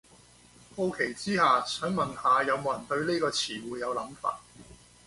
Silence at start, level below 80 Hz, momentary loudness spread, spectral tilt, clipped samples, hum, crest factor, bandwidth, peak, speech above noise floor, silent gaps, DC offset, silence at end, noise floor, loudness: 0.75 s; -62 dBFS; 10 LU; -4 dB/octave; under 0.1%; 60 Hz at -55 dBFS; 18 dB; 11.5 kHz; -12 dBFS; 28 dB; none; under 0.1%; 0.3 s; -57 dBFS; -29 LUFS